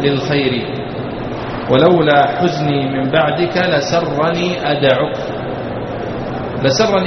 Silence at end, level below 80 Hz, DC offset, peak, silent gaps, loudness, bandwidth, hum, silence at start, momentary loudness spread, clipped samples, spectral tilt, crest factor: 0 s; -42 dBFS; under 0.1%; 0 dBFS; none; -16 LUFS; 6.6 kHz; none; 0 s; 11 LU; under 0.1%; -4.5 dB/octave; 16 dB